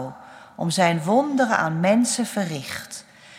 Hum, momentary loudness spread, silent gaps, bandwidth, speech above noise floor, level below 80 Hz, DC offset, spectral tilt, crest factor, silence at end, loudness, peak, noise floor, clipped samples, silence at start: none; 15 LU; none; 16 kHz; 20 dB; -68 dBFS; under 0.1%; -4.5 dB/octave; 18 dB; 0 s; -21 LUFS; -4 dBFS; -41 dBFS; under 0.1%; 0 s